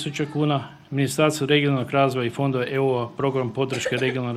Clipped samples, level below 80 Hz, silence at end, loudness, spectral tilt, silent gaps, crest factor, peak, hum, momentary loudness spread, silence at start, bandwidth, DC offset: under 0.1%; -62 dBFS; 0 s; -23 LUFS; -5.5 dB/octave; none; 18 dB; -4 dBFS; none; 6 LU; 0 s; 15.5 kHz; under 0.1%